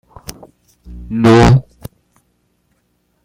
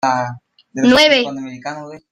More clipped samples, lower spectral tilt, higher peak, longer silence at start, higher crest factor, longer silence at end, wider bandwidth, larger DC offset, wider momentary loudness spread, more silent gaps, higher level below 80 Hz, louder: neither; first, -7 dB/octave vs -3.5 dB/octave; about the same, 0 dBFS vs 0 dBFS; first, 0.3 s vs 0.05 s; about the same, 16 dB vs 16 dB; first, 1.65 s vs 0.15 s; first, 17 kHz vs 15 kHz; neither; first, 27 LU vs 19 LU; neither; first, -30 dBFS vs -52 dBFS; about the same, -11 LUFS vs -13 LUFS